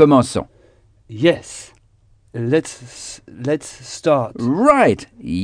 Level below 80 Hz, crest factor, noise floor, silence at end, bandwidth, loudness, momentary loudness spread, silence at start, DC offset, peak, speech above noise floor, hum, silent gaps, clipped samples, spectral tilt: -50 dBFS; 18 dB; -54 dBFS; 0 s; 10 kHz; -18 LUFS; 21 LU; 0 s; under 0.1%; 0 dBFS; 37 dB; none; none; under 0.1%; -6 dB/octave